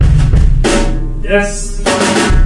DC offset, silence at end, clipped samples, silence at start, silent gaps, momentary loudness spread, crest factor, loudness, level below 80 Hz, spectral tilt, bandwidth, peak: under 0.1%; 0 s; under 0.1%; 0 s; none; 8 LU; 10 dB; -13 LUFS; -12 dBFS; -5 dB/octave; 11.5 kHz; 0 dBFS